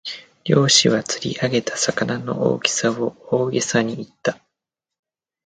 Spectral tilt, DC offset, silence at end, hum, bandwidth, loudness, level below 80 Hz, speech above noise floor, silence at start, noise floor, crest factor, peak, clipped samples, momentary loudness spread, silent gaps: -3.5 dB/octave; under 0.1%; 1.1 s; none; 9.6 kHz; -20 LUFS; -60 dBFS; 64 dB; 0.05 s; -84 dBFS; 20 dB; 0 dBFS; under 0.1%; 12 LU; none